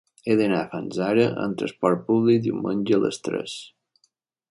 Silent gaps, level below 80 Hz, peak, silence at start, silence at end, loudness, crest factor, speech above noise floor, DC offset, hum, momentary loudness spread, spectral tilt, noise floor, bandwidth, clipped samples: none; -64 dBFS; -6 dBFS; 0.25 s; 0.85 s; -23 LUFS; 18 dB; 47 dB; under 0.1%; none; 9 LU; -6.5 dB/octave; -69 dBFS; 11.5 kHz; under 0.1%